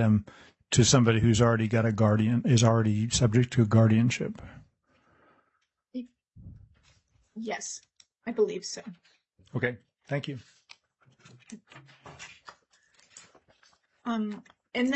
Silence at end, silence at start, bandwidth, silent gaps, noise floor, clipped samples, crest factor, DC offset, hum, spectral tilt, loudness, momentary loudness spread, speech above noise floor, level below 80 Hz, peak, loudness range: 0 s; 0 s; 8.4 kHz; none; -76 dBFS; under 0.1%; 22 dB; under 0.1%; none; -5.5 dB/octave; -26 LUFS; 24 LU; 51 dB; -54 dBFS; -6 dBFS; 19 LU